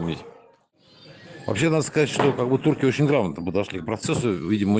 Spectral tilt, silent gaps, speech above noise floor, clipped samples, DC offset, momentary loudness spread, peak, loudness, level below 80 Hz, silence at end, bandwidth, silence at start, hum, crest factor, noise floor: -6 dB/octave; none; 35 dB; under 0.1%; under 0.1%; 9 LU; -6 dBFS; -23 LUFS; -58 dBFS; 0 s; 9.6 kHz; 0 s; none; 18 dB; -57 dBFS